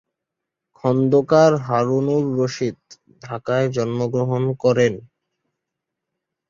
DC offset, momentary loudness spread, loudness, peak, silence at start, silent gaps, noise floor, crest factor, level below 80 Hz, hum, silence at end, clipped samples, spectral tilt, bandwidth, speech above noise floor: under 0.1%; 11 LU; -19 LUFS; -4 dBFS; 0.85 s; none; -83 dBFS; 18 dB; -60 dBFS; none; 1.5 s; under 0.1%; -7 dB/octave; 7.6 kHz; 64 dB